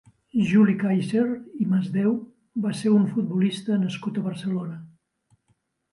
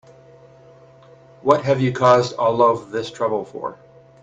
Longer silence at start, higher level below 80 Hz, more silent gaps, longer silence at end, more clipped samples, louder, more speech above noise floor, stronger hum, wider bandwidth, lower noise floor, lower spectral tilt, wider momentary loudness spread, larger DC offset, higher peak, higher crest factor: second, 0.35 s vs 1.45 s; second, -66 dBFS vs -60 dBFS; neither; first, 1.05 s vs 0.5 s; neither; second, -24 LUFS vs -19 LUFS; first, 47 dB vs 29 dB; neither; first, 11.5 kHz vs 8 kHz; first, -70 dBFS vs -47 dBFS; about the same, -7.5 dB/octave vs -6.5 dB/octave; second, 10 LU vs 14 LU; neither; second, -8 dBFS vs 0 dBFS; about the same, 16 dB vs 20 dB